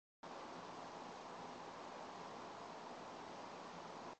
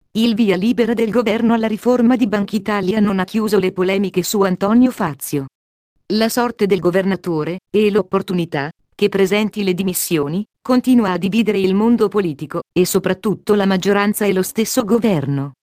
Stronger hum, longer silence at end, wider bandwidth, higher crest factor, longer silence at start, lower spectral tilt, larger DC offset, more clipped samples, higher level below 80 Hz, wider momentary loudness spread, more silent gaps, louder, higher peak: neither; second, 0 s vs 0.15 s; second, 8.4 kHz vs 15.5 kHz; about the same, 12 dB vs 14 dB; about the same, 0.25 s vs 0.15 s; second, -4 dB/octave vs -5.5 dB/octave; neither; neither; second, -82 dBFS vs -52 dBFS; second, 0 LU vs 7 LU; second, none vs 5.55-5.96 s; second, -52 LUFS vs -17 LUFS; second, -40 dBFS vs -2 dBFS